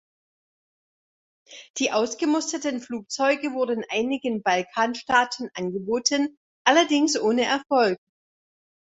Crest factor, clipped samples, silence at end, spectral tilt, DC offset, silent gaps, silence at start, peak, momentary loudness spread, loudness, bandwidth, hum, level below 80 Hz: 22 dB; under 0.1%; 0.9 s; -2.5 dB/octave; under 0.1%; 1.70-1.74 s, 6.37-6.65 s; 1.5 s; -2 dBFS; 10 LU; -24 LUFS; 8.4 kHz; none; -68 dBFS